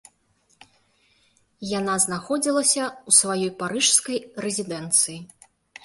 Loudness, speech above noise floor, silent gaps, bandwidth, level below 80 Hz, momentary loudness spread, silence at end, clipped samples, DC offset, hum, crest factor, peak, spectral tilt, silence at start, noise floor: -21 LUFS; 42 dB; none; 12 kHz; -66 dBFS; 12 LU; 0.6 s; under 0.1%; under 0.1%; none; 22 dB; -4 dBFS; -2 dB/octave; 1.6 s; -65 dBFS